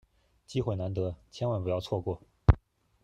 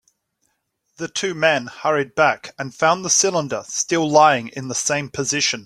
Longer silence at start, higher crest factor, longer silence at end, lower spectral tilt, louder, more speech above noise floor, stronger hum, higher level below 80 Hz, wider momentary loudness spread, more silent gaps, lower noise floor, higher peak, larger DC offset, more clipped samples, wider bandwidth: second, 0.5 s vs 1 s; first, 24 dB vs 18 dB; first, 0.45 s vs 0 s; first, -8 dB/octave vs -2.5 dB/octave; second, -32 LUFS vs -19 LUFS; second, 17 dB vs 52 dB; neither; first, -40 dBFS vs -62 dBFS; about the same, 9 LU vs 11 LU; neither; second, -49 dBFS vs -71 dBFS; second, -6 dBFS vs -2 dBFS; neither; neither; second, 9.4 kHz vs 14.5 kHz